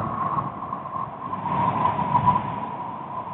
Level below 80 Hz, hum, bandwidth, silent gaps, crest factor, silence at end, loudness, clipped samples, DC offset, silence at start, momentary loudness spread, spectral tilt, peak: -52 dBFS; none; 4.1 kHz; none; 20 dB; 0 s; -25 LUFS; under 0.1%; under 0.1%; 0 s; 11 LU; -6.5 dB/octave; -6 dBFS